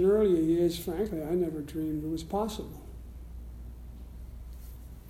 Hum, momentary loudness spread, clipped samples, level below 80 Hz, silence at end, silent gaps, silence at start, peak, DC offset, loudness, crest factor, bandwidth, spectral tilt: none; 22 LU; under 0.1%; -46 dBFS; 0 s; none; 0 s; -14 dBFS; under 0.1%; -30 LUFS; 16 dB; 16.5 kHz; -7 dB/octave